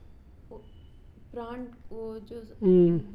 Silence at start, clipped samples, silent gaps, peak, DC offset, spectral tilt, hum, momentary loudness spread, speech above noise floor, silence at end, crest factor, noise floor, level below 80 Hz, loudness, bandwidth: 0.5 s; under 0.1%; none; -12 dBFS; under 0.1%; -11.5 dB/octave; none; 24 LU; 24 dB; 0 s; 18 dB; -50 dBFS; -52 dBFS; -26 LUFS; 4.8 kHz